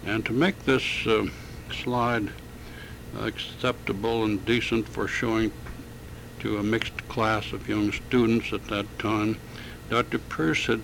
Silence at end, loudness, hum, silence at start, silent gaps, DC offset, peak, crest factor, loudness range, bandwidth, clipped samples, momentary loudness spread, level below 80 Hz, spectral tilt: 0 s; -27 LUFS; none; 0 s; none; under 0.1%; -8 dBFS; 20 dB; 2 LU; 17 kHz; under 0.1%; 17 LU; -46 dBFS; -5.5 dB/octave